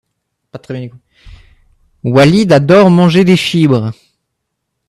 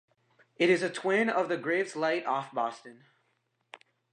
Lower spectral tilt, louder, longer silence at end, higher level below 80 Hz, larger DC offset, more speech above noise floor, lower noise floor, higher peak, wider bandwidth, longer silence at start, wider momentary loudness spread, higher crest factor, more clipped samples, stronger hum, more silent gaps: first, -7 dB/octave vs -4.5 dB/octave; first, -9 LUFS vs -29 LUFS; first, 0.95 s vs 0.35 s; first, -46 dBFS vs -86 dBFS; neither; first, 62 dB vs 47 dB; second, -72 dBFS vs -76 dBFS; first, 0 dBFS vs -12 dBFS; first, 12.5 kHz vs 10 kHz; about the same, 0.55 s vs 0.6 s; first, 18 LU vs 8 LU; second, 12 dB vs 18 dB; neither; neither; neither